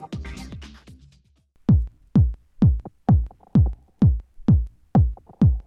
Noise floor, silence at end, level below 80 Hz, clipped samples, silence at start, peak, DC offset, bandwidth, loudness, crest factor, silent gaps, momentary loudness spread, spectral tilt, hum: -59 dBFS; 0.05 s; -28 dBFS; under 0.1%; 0 s; -6 dBFS; under 0.1%; 6.8 kHz; -22 LUFS; 14 dB; none; 14 LU; -10 dB/octave; none